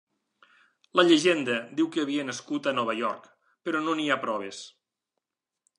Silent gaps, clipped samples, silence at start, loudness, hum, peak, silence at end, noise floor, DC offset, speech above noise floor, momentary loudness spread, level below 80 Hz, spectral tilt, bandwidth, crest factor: none; under 0.1%; 0.95 s; -26 LUFS; none; -8 dBFS; 1.1 s; -85 dBFS; under 0.1%; 59 dB; 18 LU; -82 dBFS; -4 dB/octave; 10.5 kHz; 20 dB